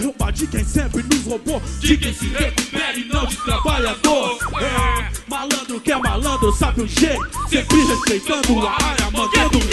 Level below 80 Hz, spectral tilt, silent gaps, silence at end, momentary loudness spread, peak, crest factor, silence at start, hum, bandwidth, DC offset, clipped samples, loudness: -26 dBFS; -4 dB/octave; none; 0 s; 6 LU; 0 dBFS; 18 dB; 0 s; none; 12.5 kHz; under 0.1%; under 0.1%; -19 LUFS